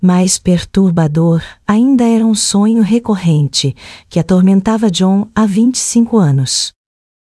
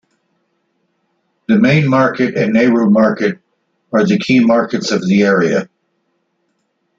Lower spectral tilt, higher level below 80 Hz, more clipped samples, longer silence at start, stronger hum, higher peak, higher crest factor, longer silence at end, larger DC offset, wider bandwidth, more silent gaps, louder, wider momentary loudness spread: about the same, -5.5 dB/octave vs -6.5 dB/octave; first, -42 dBFS vs -56 dBFS; neither; second, 0 s vs 1.5 s; neither; about the same, 0 dBFS vs -2 dBFS; about the same, 12 dB vs 14 dB; second, 0.6 s vs 1.35 s; neither; first, 12 kHz vs 7.6 kHz; neither; about the same, -12 LUFS vs -13 LUFS; second, 5 LU vs 8 LU